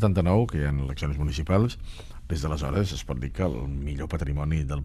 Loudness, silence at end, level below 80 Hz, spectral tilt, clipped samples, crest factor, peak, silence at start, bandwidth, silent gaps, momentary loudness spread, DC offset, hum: -27 LUFS; 0 s; -34 dBFS; -7 dB/octave; under 0.1%; 18 dB; -8 dBFS; 0 s; 13 kHz; none; 9 LU; under 0.1%; none